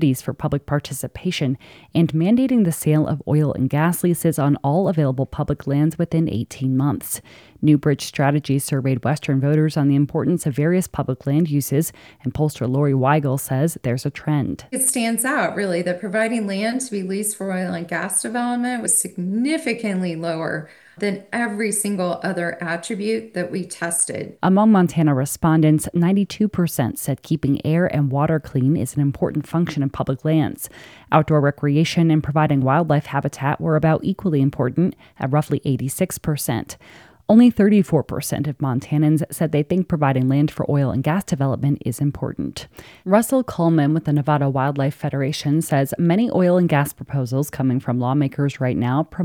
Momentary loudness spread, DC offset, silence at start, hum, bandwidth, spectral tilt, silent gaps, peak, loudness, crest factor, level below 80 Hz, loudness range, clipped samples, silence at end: 8 LU; under 0.1%; 0 s; none; 18.5 kHz; -6 dB/octave; none; 0 dBFS; -20 LUFS; 18 dB; -50 dBFS; 4 LU; under 0.1%; 0 s